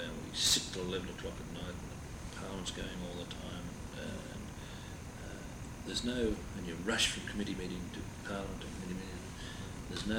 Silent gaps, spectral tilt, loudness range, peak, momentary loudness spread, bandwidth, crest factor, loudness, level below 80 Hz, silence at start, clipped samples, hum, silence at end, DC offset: none; -3 dB/octave; 7 LU; -18 dBFS; 15 LU; over 20 kHz; 22 dB; -39 LUFS; -50 dBFS; 0 s; under 0.1%; none; 0 s; under 0.1%